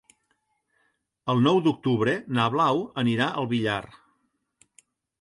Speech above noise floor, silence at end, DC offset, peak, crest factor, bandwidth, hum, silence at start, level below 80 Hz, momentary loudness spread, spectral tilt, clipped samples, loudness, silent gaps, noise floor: 49 dB; 1.35 s; under 0.1%; -8 dBFS; 18 dB; 11.5 kHz; none; 1.25 s; -64 dBFS; 6 LU; -7 dB/octave; under 0.1%; -24 LUFS; none; -73 dBFS